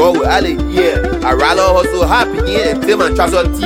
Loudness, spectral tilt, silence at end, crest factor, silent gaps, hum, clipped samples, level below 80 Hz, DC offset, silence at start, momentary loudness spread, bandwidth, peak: -12 LUFS; -5 dB/octave; 0 s; 12 dB; none; none; under 0.1%; -22 dBFS; under 0.1%; 0 s; 4 LU; 16.5 kHz; 0 dBFS